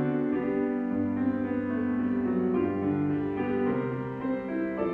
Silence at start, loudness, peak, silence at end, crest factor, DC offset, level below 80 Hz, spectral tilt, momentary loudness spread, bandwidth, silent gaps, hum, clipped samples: 0 s; -29 LUFS; -16 dBFS; 0 s; 12 dB; under 0.1%; -60 dBFS; -10.5 dB/octave; 4 LU; 4 kHz; none; none; under 0.1%